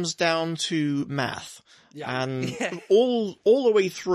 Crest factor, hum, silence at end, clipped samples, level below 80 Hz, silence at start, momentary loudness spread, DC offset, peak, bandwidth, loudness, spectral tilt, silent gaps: 16 dB; none; 0 s; under 0.1%; -66 dBFS; 0 s; 11 LU; under 0.1%; -8 dBFS; 14 kHz; -24 LUFS; -4.5 dB/octave; none